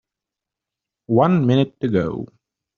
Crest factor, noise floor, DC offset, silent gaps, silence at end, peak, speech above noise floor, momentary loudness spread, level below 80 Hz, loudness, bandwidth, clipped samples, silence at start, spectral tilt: 18 dB; -86 dBFS; under 0.1%; none; 0.55 s; -2 dBFS; 68 dB; 14 LU; -56 dBFS; -19 LUFS; 6.8 kHz; under 0.1%; 1.1 s; -7.5 dB/octave